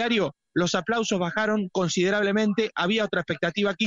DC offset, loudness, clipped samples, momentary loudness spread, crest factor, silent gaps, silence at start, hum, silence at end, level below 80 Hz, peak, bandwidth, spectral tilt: under 0.1%; -25 LUFS; under 0.1%; 4 LU; 16 dB; none; 0 s; none; 0 s; -62 dBFS; -8 dBFS; 8 kHz; -4.5 dB/octave